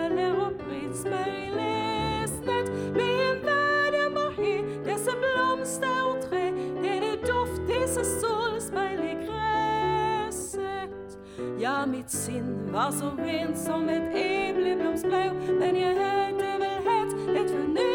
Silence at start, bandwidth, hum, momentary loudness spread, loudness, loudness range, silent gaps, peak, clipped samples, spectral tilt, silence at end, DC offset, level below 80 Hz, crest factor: 0 s; 18 kHz; none; 6 LU; -27 LUFS; 3 LU; none; -14 dBFS; under 0.1%; -4.5 dB/octave; 0 s; under 0.1%; -52 dBFS; 14 dB